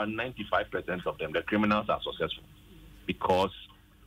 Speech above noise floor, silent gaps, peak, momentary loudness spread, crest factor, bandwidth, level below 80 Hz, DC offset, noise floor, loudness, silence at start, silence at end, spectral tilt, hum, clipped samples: 22 dB; none; -14 dBFS; 10 LU; 18 dB; 16 kHz; -54 dBFS; under 0.1%; -52 dBFS; -31 LUFS; 0 s; 0.4 s; -6 dB/octave; none; under 0.1%